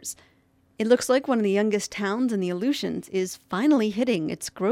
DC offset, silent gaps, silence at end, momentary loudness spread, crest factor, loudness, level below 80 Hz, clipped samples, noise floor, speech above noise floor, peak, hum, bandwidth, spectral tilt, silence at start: under 0.1%; none; 0 s; 8 LU; 18 dB; -24 LUFS; -66 dBFS; under 0.1%; -63 dBFS; 39 dB; -6 dBFS; none; 16 kHz; -5 dB/octave; 0 s